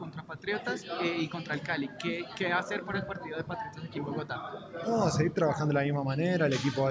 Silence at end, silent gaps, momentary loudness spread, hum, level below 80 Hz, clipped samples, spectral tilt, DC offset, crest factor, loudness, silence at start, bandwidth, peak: 0 s; none; 10 LU; none; -62 dBFS; under 0.1%; -6 dB/octave; under 0.1%; 18 dB; -32 LUFS; 0 s; 8 kHz; -14 dBFS